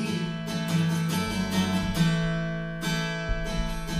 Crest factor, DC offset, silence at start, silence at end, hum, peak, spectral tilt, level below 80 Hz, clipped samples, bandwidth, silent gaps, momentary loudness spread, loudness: 16 dB; under 0.1%; 0 s; 0 s; none; -12 dBFS; -5.5 dB/octave; -38 dBFS; under 0.1%; 15.5 kHz; none; 6 LU; -28 LUFS